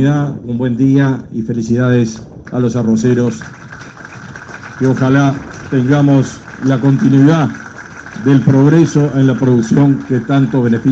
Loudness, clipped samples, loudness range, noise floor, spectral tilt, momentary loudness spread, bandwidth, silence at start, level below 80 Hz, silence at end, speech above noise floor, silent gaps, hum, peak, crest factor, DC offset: -12 LUFS; under 0.1%; 5 LU; -32 dBFS; -8 dB/octave; 21 LU; 7.8 kHz; 0 s; -46 dBFS; 0 s; 20 dB; none; none; 0 dBFS; 12 dB; under 0.1%